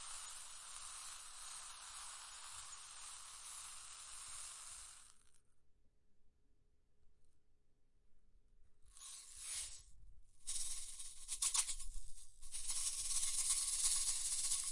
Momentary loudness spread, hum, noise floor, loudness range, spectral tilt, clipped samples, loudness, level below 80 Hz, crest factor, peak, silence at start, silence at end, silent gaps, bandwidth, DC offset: 17 LU; none; -71 dBFS; 17 LU; 2.5 dB/octave; under 0.1%; -42 LUFS; -60 dBFS; 22 dB; -22 dBFS; 0 s; 0 s; none; 11.5 kHz; under 0.1%